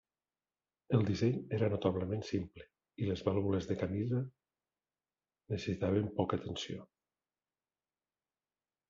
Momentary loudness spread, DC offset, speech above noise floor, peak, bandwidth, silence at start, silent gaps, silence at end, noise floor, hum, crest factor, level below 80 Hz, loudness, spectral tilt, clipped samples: 10 LU; under 0.1%; over 55 dB; -16 dBFS; 7.6 kHz; 0.9 s; none; 2.05 s; under -90 dBFS; none; 20 dB; -68 dBFS; -36 LUFS; -7 dB/octave; under 0.1%